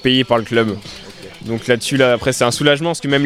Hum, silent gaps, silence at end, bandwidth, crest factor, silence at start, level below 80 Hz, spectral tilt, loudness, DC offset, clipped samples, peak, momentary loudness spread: none; none; 0 s; 16 kHz; 16 dB; 0 s; -46 dBFS; -4.5 dB/octave; -16 LUFS; under 0.1%; under 0.1%; 0 dBFS; 18 LU